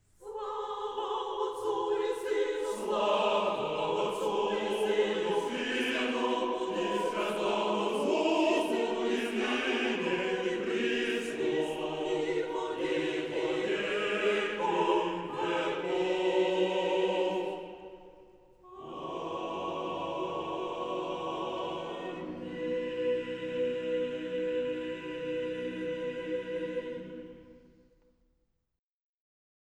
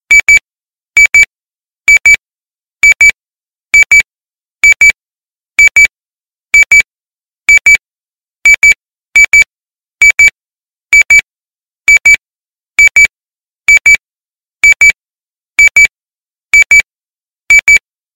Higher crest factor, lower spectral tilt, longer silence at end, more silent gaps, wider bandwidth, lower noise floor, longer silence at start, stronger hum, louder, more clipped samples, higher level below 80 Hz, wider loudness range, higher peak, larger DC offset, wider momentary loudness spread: first, 18 dB vs 8 dB; first, -4.5 dB/octave vs 1.5 dB/octave; first, 2.05 s vs 0.35 s; second, none vs 2.63-2.67 s, 10.62-10.66 s, 13.16-13.20 s, 14.13-14.17 s; second, 14 kHz vs 17.5 kHz; about the same, under -90 dBFS vs under -90 dBFS; about the same, 0.2 s vs 0.1 s; neither; second, -32 LUFS vs -5 LUFS; second, under 0.1% vs 0.3%; second, -68 dBFS vs -36 dBFS; first, 8 LU vs 1 LU; second, -14 dBFS vs 0 dBFS; neither; about the same, 9 LU vs 7 LU